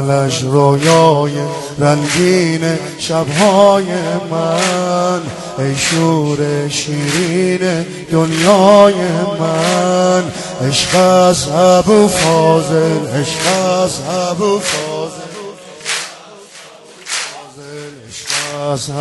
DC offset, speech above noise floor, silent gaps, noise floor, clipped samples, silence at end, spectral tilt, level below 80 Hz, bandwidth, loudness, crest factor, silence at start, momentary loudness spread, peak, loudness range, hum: under 0.1%; 24 dB; none; -37 dBFS; under 0.1%; 0 s; -4.5 dB/octave; -48 dBFS; 12 kHz; -13 LUFS; 14 dB; 0 s; 13 LU; 0 dBFS; 9 LU; none